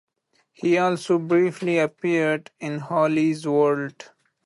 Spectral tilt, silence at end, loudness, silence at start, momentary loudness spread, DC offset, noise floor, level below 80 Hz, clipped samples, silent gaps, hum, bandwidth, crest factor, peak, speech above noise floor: -6.5 dB/octave; 0.4 s; -22 LUFS; 0.6 s; 8 LU; under 0.1%; -67 dBFS; -72 dBFS; under 0.1%; none; none; 11.5 kHz; 14 dB; -8 dBFS; 46 dB